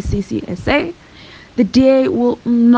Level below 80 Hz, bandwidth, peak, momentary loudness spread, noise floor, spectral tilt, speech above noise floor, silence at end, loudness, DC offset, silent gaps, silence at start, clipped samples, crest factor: -34 dBFS; 7.8 kHz; -2 dBFS; 12 LU; -39 dBFS; -7 dB/octave; 26 dB; 0 s; -15 LUFS; under 0.1%; none; 0 s; under 0.1%; 12 dB